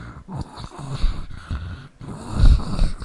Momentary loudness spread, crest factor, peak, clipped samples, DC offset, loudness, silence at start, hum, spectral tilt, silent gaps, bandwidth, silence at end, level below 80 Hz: 17 LU; 20 dB; 0 dBFS; under 0.1%; under 0.1%; -25 LUFS; 0 s; none; -6.5 dB/octave; none; 11 kHz; 0 s; -22 dBFS